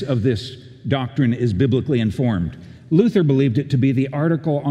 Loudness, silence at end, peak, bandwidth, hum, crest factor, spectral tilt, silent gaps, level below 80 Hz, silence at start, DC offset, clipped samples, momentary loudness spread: -19 LUFS; 0 s; -2 dBFS; 9.2 kHz; none; 16 dB; -8.5 dB/octave; none; -50 dBFS; 0 s; under 0.1%; under 0.1%; 8 LU